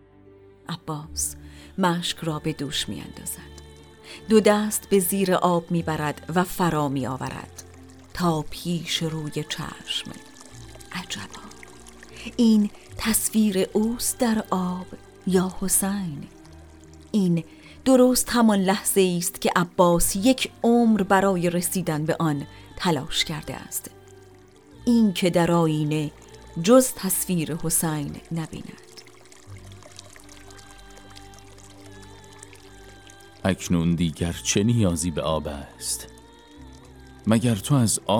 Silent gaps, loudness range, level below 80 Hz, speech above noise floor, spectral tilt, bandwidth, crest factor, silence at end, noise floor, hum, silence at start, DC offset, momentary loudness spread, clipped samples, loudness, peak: none; 9 LU; -48 dBFS; 28 dB; -4.5 dB/octave; over 20 kHz; 20 dB; 0 s; -51 dBFS; none; 0.7 s; under 0.1%; 22 LU; under 0.1%; -23 LUFS; -4 dBFS